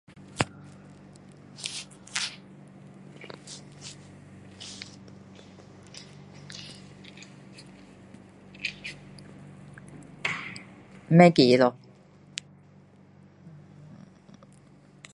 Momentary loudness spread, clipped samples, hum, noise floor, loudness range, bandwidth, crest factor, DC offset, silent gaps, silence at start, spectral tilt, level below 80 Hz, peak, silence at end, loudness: 27 LU; under 0.1%; none; -54 dBFS; 22 LU; 11.5 kHz; 28 dB; under 0.1%; none; 0.4 s; -5.5 dB/octave; -64 dBFS; -2 dBFS; 3.45 s; -26 LUFS